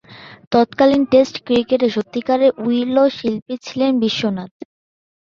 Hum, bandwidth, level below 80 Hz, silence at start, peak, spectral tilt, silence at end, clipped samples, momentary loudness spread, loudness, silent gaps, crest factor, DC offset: none; 7.2 kHz; -56 dBFS; 0.1 s; -2 dBFS; -6 dB/octave; 0.75 s; under 0.1%; 9 LU; -17 LUFS; 0.47-0.51 s, 3.42-3.46 s; 16 dB; under 0.1%